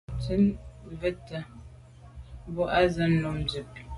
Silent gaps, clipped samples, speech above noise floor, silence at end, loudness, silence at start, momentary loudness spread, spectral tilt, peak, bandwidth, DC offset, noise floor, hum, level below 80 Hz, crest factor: none; under 0.1%; 22 dB; 0 s; -28 LUFS; 0.1 s; 22 LU; -7 dB/octave; -10 dBFS; 11.5 kHz; under 0.1%; -49 dBFS; none; -44 dBFS; 20 dB